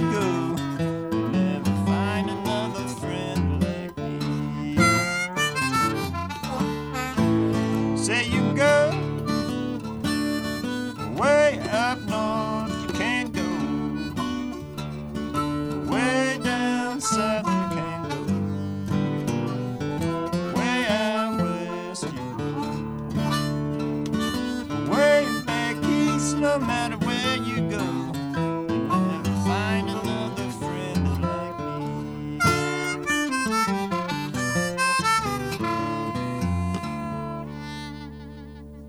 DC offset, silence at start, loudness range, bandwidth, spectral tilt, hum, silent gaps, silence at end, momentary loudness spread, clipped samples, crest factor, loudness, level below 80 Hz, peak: under 0.1%; 0 s; 4 LU; 19.5 kHz; -5 dB/octave; none; none; 0 s; 9 LU; under 0.1%; 18 dB; -25 LUFS; -48 dBFS; -6 dBFS